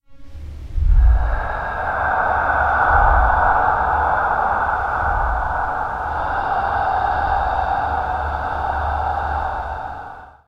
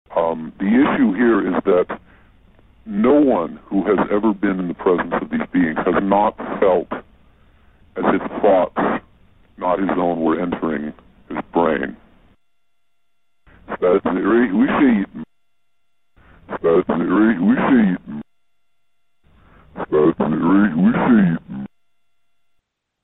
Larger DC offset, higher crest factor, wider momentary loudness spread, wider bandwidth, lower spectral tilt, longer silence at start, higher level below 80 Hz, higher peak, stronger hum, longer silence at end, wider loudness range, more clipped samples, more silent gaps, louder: second, under 0.1% vs 0.1%; about the same, 18 dB vs 16 dB; second, 10 LU vs 14 LU; first, 6 kHz vs 4 kHz; second, -7 dB/octave vs -11 dB/octave; about the same, 0.1 s vs 0.1 s; first, -24 dBFS vs -50 dBFS; about the same, -2 dBFS vs -2 dBFS; neither; second, 0.2 s vs 1.4 s; about the same, 4 LU vs 4 LU; neither; neither; about the same, -19 LUFS vs -18 LUFS